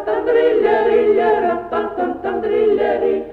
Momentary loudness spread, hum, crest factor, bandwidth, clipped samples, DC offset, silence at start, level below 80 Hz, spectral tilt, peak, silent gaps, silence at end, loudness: 8 LU; none; 12 dB; 4.7 kHz; under 0.1%; under 0.1%; 0 s; -48 dBFS; -7 dB/octave; -4 dBFS; none; 0 s; -16 LUFS